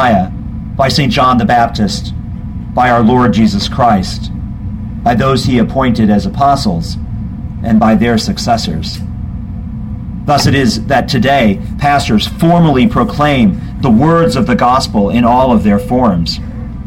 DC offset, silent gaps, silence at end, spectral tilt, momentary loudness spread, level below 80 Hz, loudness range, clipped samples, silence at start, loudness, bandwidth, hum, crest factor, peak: under 0.1%; none; 0 s; -6 dB/octave; 13 LU; -26 dBFS; 4 LU; under 0.1%; 0 s; -11 LUFS; 16 kHz; none; 10 dB; 0 dBFS